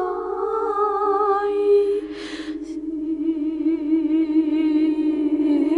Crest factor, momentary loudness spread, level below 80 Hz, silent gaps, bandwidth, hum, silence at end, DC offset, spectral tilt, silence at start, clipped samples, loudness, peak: 12 dB; 11 LU; -54 dBFS; none; 7.4 kHz; none; 0 s; under 0.1%; -6 dB/octave; 0 s; under 0.1%; -21 LUFS; -10 dBFS